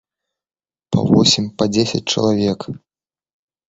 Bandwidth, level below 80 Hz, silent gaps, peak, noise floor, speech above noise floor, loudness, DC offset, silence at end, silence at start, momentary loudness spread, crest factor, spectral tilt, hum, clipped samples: 8 kHz; -48 dBFS; none; 0 dBFS; under -90 dBFS; over 74 dB; -16 LUFS; under 0.1%; 0.9 s; 0.9 s; 14 LU; 18 dB; -5 dB/octave; none; under 0.1%